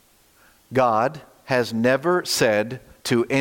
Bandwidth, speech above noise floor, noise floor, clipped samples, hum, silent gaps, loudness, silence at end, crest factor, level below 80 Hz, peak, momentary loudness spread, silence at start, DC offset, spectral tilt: 17 kHz; 36 dB; -56 dBFS; under 0.1%; none; none; -22 LUFS; 0 s; 16 dB; -60 dBFS; -6 dBFS; 9 LU; 0.7 s; under 0.1%; -4.5 dB/octave